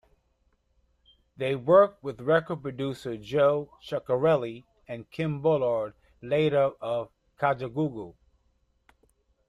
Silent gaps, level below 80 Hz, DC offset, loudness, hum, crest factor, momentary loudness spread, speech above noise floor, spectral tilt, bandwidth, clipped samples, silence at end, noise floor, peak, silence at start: none; -64 dBFS; under 0.1%; -27 LUFS; none; 20 dB; 17 LU; 44 dB; -7.5 dB/octave; 11 kHz; under 0.1%; 1.4 s; -70 dBFS; -8 dBFS; 1.4 s